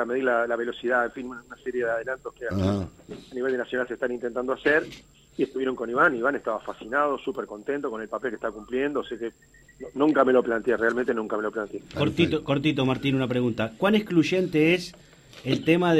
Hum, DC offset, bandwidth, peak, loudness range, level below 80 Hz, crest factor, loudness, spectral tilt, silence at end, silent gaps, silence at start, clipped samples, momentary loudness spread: none; under 0.1%; 13.5 kHz; -6 dBFS; 5 LU; -56 dBFS; 20 dB; -26 LUFS; -6.5 dB/octave; 0 s; none; 0 s; under 0.1%; 12 LU